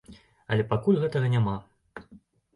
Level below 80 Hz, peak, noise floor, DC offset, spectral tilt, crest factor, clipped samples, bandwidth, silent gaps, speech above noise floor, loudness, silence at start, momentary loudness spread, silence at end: -56 dBFS; -10 dBFS; -56 dBFS; under 0.1%; -8.5 dB/octave; 16 dB; under 0.1%; 10.5 kHz; none; 31 dB; -26 LUFS; 0.1 s; 22 LU; 0.4 s